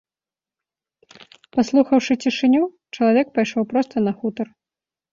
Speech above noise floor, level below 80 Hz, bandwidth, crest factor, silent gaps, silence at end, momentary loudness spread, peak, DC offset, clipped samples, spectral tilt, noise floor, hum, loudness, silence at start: over 71 dB; -64 dBFS; 7.6 kHz; 18 dB; none; 0.7 s; 9 LU; -4 dBFS; under 0.1%; under 0.1%; -5.5 dB/octave; under -90 dBFS; none; -20 LUFS; 1.55 s